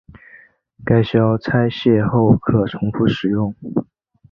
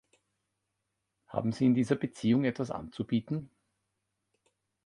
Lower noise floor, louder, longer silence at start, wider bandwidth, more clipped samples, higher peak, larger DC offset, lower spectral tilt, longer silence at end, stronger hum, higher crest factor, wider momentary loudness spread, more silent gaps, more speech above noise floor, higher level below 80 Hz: second, -48 dBFS vs -83 dBFS; first, -17 LUFS vs -31 LUFS; second, 0.35 s vs 1.3 s; second, 6 kHz vs 11 kHz; neither; first, -2 dBFS vs -14 dBFS; neither; first, -9.5 dB/octave vs -7.5 dB/octave; second, 0.5 s vs 1.4 s; neither; about the same, 16 dB vs 20 dB; about the same, 9 LU vs 11 LU; neither; second, 32 dB vs 54 dB; first, -44 dBFS vs -66 dBFS